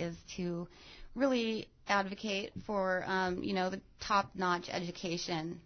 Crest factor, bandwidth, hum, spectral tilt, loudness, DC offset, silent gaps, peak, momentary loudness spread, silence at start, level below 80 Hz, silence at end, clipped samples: 18 dB; 6.6 kHz; none; -4.5 dB/octave; -35 LUFS; under 0.1%; none; -18 dBFS; 9 LU; 0 s; -60 dBFS; 0.05 s; under 0.1%